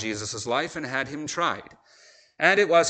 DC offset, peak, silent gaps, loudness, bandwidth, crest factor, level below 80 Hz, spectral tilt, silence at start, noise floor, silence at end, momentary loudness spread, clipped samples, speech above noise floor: under 0.1%; -4 dBFS; none; -25 LUFS; 9.2 kHz; 22 dB; -64 dBFS; -3 dB/octave; 0 s; -55 dBFS; 0 s; 10 LU; under 0.1%; 31 dB